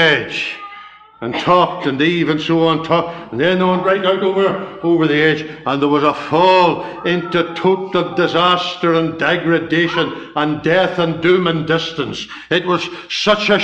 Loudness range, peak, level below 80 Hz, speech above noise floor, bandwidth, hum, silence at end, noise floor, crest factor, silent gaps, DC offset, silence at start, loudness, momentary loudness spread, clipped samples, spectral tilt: 2 LU; -2 dBFS; -52 dBFS; 23 dB; 8.4 kHz; none; 0 s; -38 dBFS; 14 dB; none; under 0.1%; 0 s; -16 LUFS; 8 LU; under 0.1%; -6 dB/octave